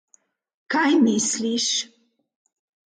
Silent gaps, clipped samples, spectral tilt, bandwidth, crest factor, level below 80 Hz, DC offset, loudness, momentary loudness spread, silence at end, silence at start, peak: none; under 0.1%; -2.5 dB/octave; 9.4 kHz; 16 dB; -74 dBFS; under 0.1%; -21 LUFS; 8 LU; 1.1 s; 0.7 s; -8 dBFS